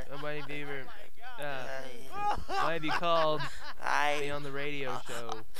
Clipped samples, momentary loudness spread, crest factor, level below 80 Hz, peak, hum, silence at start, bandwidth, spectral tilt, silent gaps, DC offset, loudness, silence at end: under 0.1%; 14 LU; 20 dB; -56 dBFS; -16 dBFS; none; 0 s; 15.5 kHz; -4 dB/octave; none; 4%; -34 LUFS; 0 s